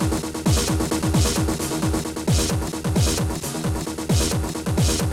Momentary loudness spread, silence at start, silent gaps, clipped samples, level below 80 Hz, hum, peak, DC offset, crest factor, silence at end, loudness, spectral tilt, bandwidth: 5 LU; 0 s; none; under 0.1%; -30 dBFS; none; -10 dBFS; under 0.1%; 12 dB; 0 s; -22 LUFS; -4.5 dB/octave; 16 kHz